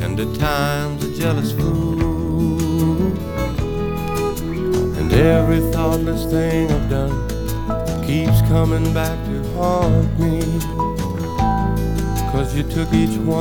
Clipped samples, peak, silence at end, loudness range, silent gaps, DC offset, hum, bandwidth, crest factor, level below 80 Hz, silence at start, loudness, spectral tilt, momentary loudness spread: under 0.1%; 0 dBFS; 0 s; 2 LU; none; under 0.1%; none; 19 kHz; 18 dB; -26 dBFS; 0 s; -19 LUFS; -7 dB/octave; 7 LU